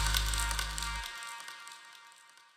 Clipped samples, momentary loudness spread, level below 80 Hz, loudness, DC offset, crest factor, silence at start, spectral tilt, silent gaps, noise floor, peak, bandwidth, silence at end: under 0.1%; 22 LU; -40 dBFS; -35 LUFS; under 0.1%; 26 dB; 0 s; -1 dB/octave; none; -58 dBFS; -10 dBFS; 16.5 kHz; 0.3 s